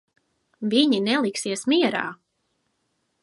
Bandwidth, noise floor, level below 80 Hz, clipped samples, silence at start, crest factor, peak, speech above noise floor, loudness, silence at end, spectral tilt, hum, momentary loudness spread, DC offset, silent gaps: 11.5 kHz; -73 dBFS; -76 dBFS; under 0.1%; 0.6 s; 20 dB; -6 dBFS; 51 dB; -22 LUFS; 1.1 s; -3.5 dB/octave; none; 10 LU; under 0.1%; none